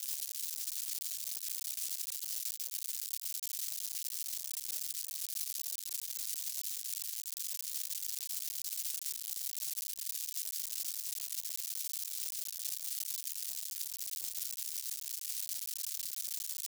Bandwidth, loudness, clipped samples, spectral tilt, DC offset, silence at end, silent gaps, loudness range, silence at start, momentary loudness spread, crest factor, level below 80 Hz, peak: over 20 kHz; -37 LUFS; under 0.1%; 9.5 dB/octave; under 0.1%; 0 s; none; 1 LU; 0 s; 1 LU; 22 dB; under -90 dBFS; -18 dBFS